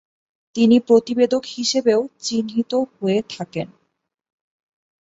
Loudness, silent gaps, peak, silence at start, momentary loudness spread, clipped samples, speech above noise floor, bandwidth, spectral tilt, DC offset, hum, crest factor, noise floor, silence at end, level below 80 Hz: -19 LUFS; none; -2 dBFS; 0.55 s; 13 LU; under 0.1%; 54 dB; 8 kHz; -5 dB/octave; under 0.1%; none; 18 dB; -72 dBFS; 1.35 s; -64 dBFS